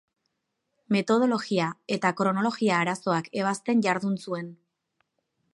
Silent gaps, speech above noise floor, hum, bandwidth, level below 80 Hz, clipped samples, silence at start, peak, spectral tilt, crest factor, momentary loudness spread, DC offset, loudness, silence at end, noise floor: none; 54 dB; none; 11.5 kHz; -78 dBFS; under 0.1%; 0.9 s; -8 dBFS; -5.5 dB/octave; 18 dB; 7 LU; under 0.1%; -26 LUFS; 1 s; -80 dBFS